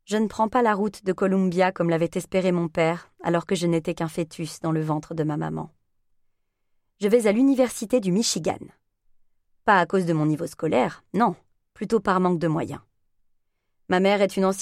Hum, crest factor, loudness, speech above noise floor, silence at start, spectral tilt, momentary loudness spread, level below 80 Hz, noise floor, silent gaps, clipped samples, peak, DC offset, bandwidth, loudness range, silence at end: none; 20 dB; -23 LUFS; 47 dB; 0.1 s; -5.5 dB/octave; 10 LU; -60 dBFS; -70 dBFS; none; under 0.1%; -4 dBFS; under 0.1%; 15 kHz; 4 LU; 0 s